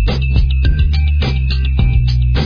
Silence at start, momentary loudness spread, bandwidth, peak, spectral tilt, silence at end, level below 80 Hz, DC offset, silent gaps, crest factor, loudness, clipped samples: 0 s; 2 LU; 5.4 kHz; -2 dBFS; -7.5 dB/octave; 0 s; -14 dBFS; under 0.1%; none; 10 dB; -15 LUFS; under 0.1%